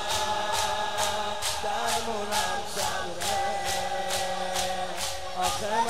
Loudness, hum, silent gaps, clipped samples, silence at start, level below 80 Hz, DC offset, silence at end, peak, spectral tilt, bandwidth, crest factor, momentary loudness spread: -28 LUFS; none; none; under 0.1%; 0 s; -52 dBFS; 2%; 0 s; -10 dBFS; -1.5 dB/octave; 16 kHz; 18 dB; 3 LU